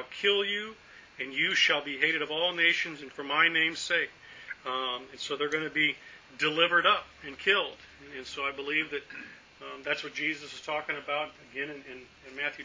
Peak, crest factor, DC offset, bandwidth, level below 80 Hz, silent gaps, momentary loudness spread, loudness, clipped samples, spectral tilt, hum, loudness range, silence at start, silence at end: -10 dBFS; 22 dB; under 0.1%; 7.6 kHz; -70 dBFS; none; 20 LU; -28 LUFS; under 0.1%; -2.5 dB/octave; none; 8 LU; 0 s; 0 s